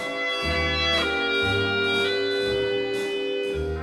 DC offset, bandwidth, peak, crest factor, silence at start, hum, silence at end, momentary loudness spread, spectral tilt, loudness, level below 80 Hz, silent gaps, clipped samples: under 0.1%; 13.5 kHz; -12 dBFS; 14 dB; 0 s; none; 0 s; 5 LU; -4.5 dB/octave; -23 LUFS; -40 dBFS; none; under 0.1%